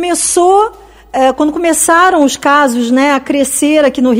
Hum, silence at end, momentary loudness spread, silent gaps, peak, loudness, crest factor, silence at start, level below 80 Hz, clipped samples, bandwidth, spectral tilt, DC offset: none; 0 s; 5 LU; none; 0 dBFS; -10 LUFS; 10 dB; 0 s; -44 dBFS; 0.7%; 16.5 kHz; -2 dB/octave; under 0.1%